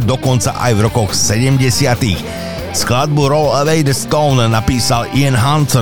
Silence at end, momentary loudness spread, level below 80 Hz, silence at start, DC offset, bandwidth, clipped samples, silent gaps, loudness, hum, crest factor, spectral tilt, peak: 0 s; 4 LU; -34 dBFS; 0 s; 3%; 19 kHz; under 0.1%; none; -13 LUFS; none; 12 dB; -5 dB/octave; -2 dBFS